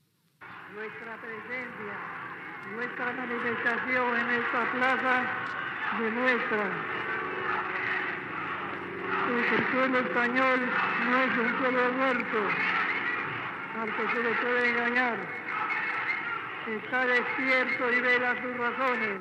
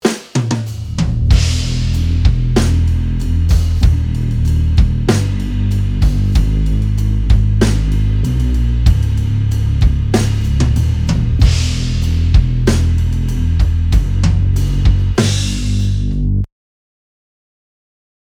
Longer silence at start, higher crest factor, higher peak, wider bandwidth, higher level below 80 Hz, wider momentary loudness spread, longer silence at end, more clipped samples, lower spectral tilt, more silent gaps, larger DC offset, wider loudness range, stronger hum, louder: first, 0.4 s vs 0.05 s; about the same, 16 dB vs 12 dB; second, -12 dBFS vs 0 dBFS; second, 9.2 kHz vs 15 kHz; second, -76 dBFS vs -16 dBFS; first, 11 LU vs 4 LU; second, 0 s vs 1.9 s; neither; about the same, -5.5 dB/octave vs -6.5 dB/octave; neither; neither; first, 4 LU vs 1 LU; neither; second, -28 LUFS vs -15 LUFS